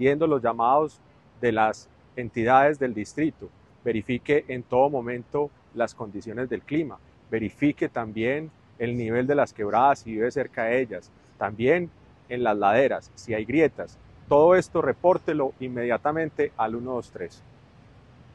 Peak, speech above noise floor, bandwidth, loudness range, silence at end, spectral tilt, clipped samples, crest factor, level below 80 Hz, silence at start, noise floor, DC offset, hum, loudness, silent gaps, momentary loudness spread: -6 dBFS; 28 dB; 10 kHz; 5 LU; 1.05 s; -7 dB/octave; under 0.1%; 20 dB; -58 dBFS; 0 s; -52 dBFS; under 0.1%; none; -25 LUFS; none; 12 LU